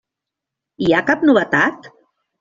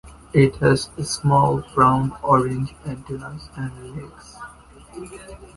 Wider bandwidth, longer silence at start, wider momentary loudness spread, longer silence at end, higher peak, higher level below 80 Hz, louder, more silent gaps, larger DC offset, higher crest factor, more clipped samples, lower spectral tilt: second, 7.4 kHz vs 11.5 kHz; first, 0.8 s vs 0.05 s; second, 5 LU vs 22 LU; first, 0.5 s vs 0.1 s; about the same, -2 dBFS vs -2 dBFS; second, -54 dBFS vs -44 dBFS; first, -16 LUFS vs -19 LUFS; neither; neither; about the same, 18 dB vs 20 dB; neither; about the same, -6 dB/octave vs -6 dB/octave